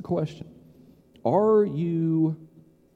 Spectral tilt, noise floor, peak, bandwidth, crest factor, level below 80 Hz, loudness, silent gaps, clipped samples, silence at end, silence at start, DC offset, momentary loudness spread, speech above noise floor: -10 dB/octave; -54 dBFS; -10 dBFS; 7.4 kHz; 16 dB; -64 dBFS; -24 LUFS; none; under 0.1%; 0.5 s; 0 s; under 0.1%; 15 LU; 31 dB